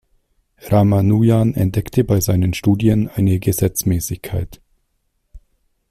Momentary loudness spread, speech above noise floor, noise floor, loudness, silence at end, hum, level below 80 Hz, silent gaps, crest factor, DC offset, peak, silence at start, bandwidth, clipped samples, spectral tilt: 10 LU; 52 dB; -67 dBFS; -17 LUFS; 0.55 s; none; -40 dBFS; none; 14 dB; under 0.1%; -2 dBFS; 0.65 s; 16 kHz; under 0.1%; -7 dB/octave